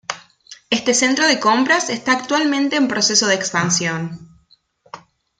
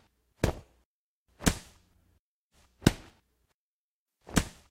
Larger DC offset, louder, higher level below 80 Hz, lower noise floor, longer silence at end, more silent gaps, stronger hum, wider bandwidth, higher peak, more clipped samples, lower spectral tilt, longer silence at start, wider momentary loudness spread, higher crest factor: neither; first, -16 LUFS vs -31 LUFS; second, -62 dBFS vs -44 dBFS; second, -56 dBFS vs under -90 dBFS; first, 0.4 s vs 0.2 s; second, none vs 0.85-1.26 s, 2.19-2.50 s, 3.54-4.06 s; neither; second, 10 kHz vs 16 kHz; about the same, -2 dBFS vs -2 dBFS; neither; second, -2.5 dB/octave vs -4.5 dB/octave; second, 0.1 s vs 0.45 s; about the same, 13 LU vs 14 LU; second, 18 dB vs 32 dB